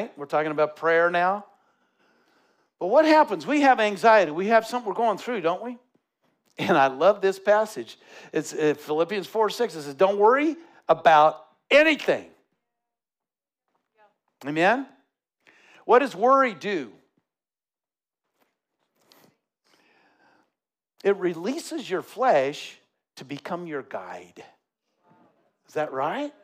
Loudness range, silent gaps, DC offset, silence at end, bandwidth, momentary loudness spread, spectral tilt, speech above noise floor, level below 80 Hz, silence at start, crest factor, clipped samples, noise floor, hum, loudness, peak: 11 LU; none; under 0.1%; 0.15 s; 15.5 kHz; 18 LU; -4.5 dB/octave; over 67 dB; -78 dBFS; 0 s; 22 dB; under 0.1%; under -90 dBFS; none; -23 LUFS; -4 dBFS